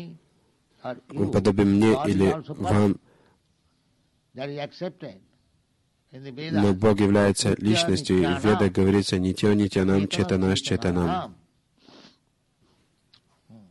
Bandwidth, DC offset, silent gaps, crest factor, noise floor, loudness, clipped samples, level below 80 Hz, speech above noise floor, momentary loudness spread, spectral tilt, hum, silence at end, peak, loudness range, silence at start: 12 kHz; under 0.1%; none; 16 dB; -69 dBFS; -23 LUFS; under 0.1%; -46 dBFS; 46 dB; 17 LU; -6 dB/octave; none; 0.15 s; -8 dBFS; 10 LU; 0 s